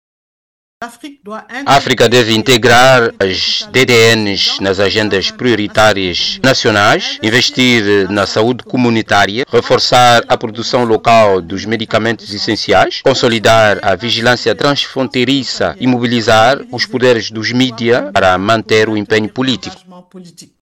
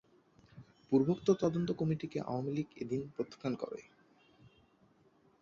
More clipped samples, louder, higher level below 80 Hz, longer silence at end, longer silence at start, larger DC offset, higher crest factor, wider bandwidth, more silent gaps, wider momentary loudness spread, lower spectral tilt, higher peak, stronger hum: neither; first, -11 LUFS vs -35 LUFS; first, -44 dBFS vs -70 dBFS; second, 0.2 s vs 1.6 s; first, 0.8 s vs 0.55 s; neither; second, 10 dB vs 22 dB; first, over 20 kHz vs 7.4 kHz; neither; about the same, 8 LU vs 10 LU; second, -4 dB/octave vs -8 dB/octave; first, -2 dBFS vs -16 dBFS; neither